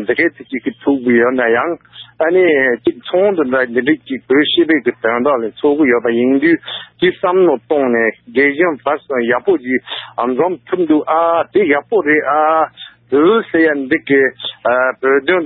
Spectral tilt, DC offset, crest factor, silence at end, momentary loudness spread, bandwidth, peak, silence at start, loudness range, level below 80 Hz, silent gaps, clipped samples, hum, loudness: -10.5 dB/octave; under 0.1%; 12 dB; 0 s; 7 LU; 4.6 kHz; -2 dBFS; 0 s; 2 LU; -58 dBFS; none; under 0.1%; none; -14 LUFS